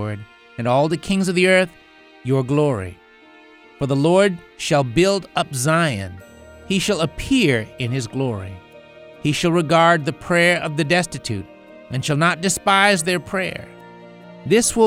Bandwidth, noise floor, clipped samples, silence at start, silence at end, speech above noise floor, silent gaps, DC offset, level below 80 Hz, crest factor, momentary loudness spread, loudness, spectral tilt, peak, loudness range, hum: 16.5 kHz; -47 dBFS; under 0.1%; 0 s; 0 s; 29 dB; none; under 0.1%; -46 dBFS; 18 dB; 14 LU; -19 LUFS; -4.5 dB/octave; 0 dBFS; 3 LU; none